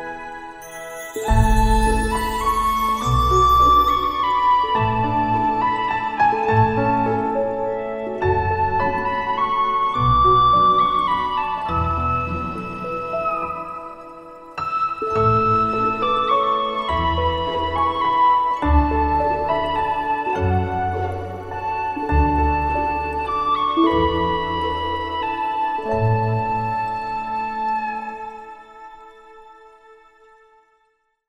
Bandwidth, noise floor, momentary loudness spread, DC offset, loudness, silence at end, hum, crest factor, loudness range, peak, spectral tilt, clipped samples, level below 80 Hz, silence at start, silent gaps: 16 kHz; -66 dBFS; 12 LU; under 0.1%; -20 LUFS; 1.75 s; none; 16 dB; 7 LU; -4 dBFS; -6 dB/octave; under 0.1%; -30 dBFS; 0 s; none